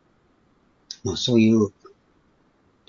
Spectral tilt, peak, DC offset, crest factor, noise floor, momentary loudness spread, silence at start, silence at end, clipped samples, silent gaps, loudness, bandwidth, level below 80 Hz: -5.5 dB/octave; -6 dBFS; under 0.1%; 18 dB; -62 dBFS; 15 LU; 1.05 s; 1.2 s; under 0.1%; none; -21 LUFS; 7.4 kHz; -58 dBFS